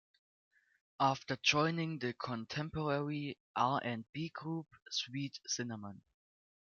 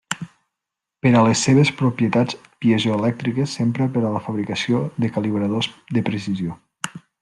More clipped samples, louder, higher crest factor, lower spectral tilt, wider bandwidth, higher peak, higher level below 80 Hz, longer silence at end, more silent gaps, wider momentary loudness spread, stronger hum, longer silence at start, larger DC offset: neither; second, -37 LUFS vs -20 LUFS; first, 24 dB vs 18 dB; second, -4 dB/octave vs -5.5 dB/octave; second, 7.2 kHz vs 12 kHz; second, -14 dBFS vs -2 dBFS; second, -72 dBFS vs -58 dBFS; first, 0.6 s vs 0.25 s; first, 3.40-3.54 s, 4.09-4.13 s, 4.82-4.86 s vs none; second, 11 LU vs 14 LU; neither; first, 1 s vs 0.1 s; neither